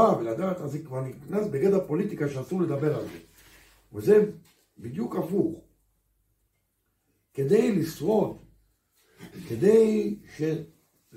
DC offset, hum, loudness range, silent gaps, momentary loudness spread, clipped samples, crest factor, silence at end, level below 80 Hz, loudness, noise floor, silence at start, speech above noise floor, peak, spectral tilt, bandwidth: under 0.1%; none; 4 LU; none; 19 LU; under 0.1%; 20 dB; 0.5 s; -64 dBFS; -26 LUFS; -74 dBFS; 0 s; 49 dB; -8 dBFS; -7.5 dB/octave; 16 kHz